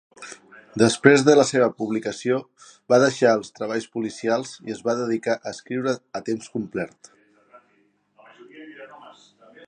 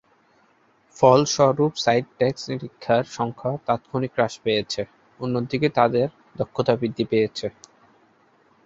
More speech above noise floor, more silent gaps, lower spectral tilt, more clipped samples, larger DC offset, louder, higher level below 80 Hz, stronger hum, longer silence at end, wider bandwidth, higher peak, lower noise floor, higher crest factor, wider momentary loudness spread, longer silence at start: first, 43 dB vs 39 dB; neither; about the same, -5 dB/octave vs -5.5 dB/octave; neither; neither; about the same, -22 LUFS vs -23 LUFS; second, -66 dBFS vs -58 dBFS; neither; second, 0.6 s vs 1.15 s; first, 10 kHz vs 7.8 kHz; about the same, 0 dBFS vs -2 dBFS; first, -64 dBFS vs -60 dBFS; about the same, 22 dB vs 22 dB; first, 24 LU vs 13 LU; second, 0.2 s vs 0.95 s